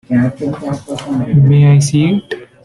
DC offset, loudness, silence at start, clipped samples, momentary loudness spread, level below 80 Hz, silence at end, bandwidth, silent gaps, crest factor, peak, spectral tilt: under 0.1%; -13 LUFS; 0.1 s; under 0.1%; 14 LU; -44 dBFS; 0.2 s; 11.5 kHz; none; 10 dB; -2 dBFS; -7 dB/octave